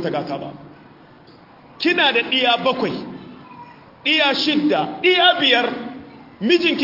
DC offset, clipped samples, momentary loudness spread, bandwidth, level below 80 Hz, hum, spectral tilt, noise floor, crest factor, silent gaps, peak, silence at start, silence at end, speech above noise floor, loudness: under 0.1%; under 0.1%; 18 LU; 5.8 kHz; -64 dBFS; none; -4.5 dB/octave; -46 dBFS; 16 dB; none; -4 dBFS; 0 s; 0 s; 28 dB; -17 LUFS